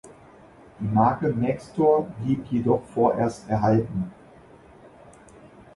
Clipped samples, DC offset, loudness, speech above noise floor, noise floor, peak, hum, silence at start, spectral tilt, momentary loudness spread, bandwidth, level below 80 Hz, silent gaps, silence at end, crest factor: under 0.1%; under 0.1%; -24 LUFS; 27 dB; -50 dBFS; -6 dBFS; none; 0.05 s; -9 dB/octave; 8 LU; 11.5 kHz; -54 dBFS; none; 1.6 s; 18 dB